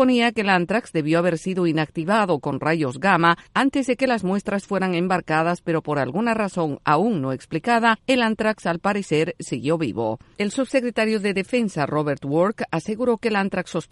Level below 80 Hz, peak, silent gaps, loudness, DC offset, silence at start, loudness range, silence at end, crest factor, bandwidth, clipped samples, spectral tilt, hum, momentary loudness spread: -58 dBFS; -2 dBFS; none; -22 LUFS; under 0.1%; 0 s; 2 LU; 0.1 s; 18 dB; 11.5 kHz; under 0.1%; -6 dB/octave; none; 6 LU